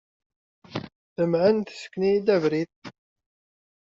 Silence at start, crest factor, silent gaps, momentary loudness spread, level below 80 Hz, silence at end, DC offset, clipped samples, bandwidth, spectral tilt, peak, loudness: 0.7 s; 18 dB; 0.95-1.16 s, 2.76-2.82 s; 17 LU; -66 dBFS; 1 s; under 0.1%; under 0.1%; 7.6 kHz; -6 dB/octave; -8 dBFS; -24 LUFS